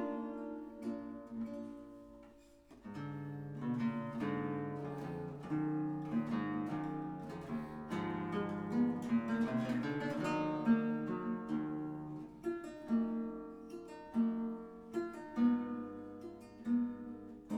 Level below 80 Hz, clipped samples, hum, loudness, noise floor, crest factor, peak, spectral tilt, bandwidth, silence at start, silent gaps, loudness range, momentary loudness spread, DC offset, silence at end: -68 dBFS; under 0.1%; none; -39 LUFS; -61 dBFS; 18 dB; -20 dBFS; -8 dB/octave; 8.8 kHz; 0 s; none; 7 LU; 14 LU; under 0.1%; 0 s